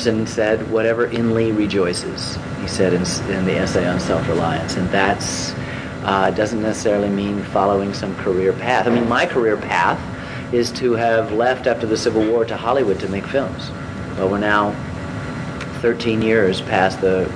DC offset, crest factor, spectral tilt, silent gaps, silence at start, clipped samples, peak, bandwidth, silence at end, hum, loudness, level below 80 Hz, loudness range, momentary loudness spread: under 0.1%; 18 dB; -5.5 dB/octave; none; 0 s; under 0.1%; -2 dBFS; 11 kHz; 0 s; none; -19 LUFS; -42 dBFS; 2 LU; 9 LU